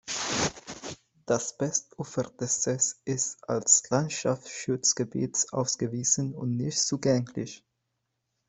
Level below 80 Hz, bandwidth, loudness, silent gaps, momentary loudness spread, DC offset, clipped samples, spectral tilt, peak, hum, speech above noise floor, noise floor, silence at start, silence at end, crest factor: -64 dBFS; 8.4 kHz; -27 LUFS; none; 12 LU; under 0.1%; under 0.1%; -3.5 dB/octave; -6 dBFS; none; 52 dB; -80 dBFS; 0.05 s; 0.9 s; 24 dB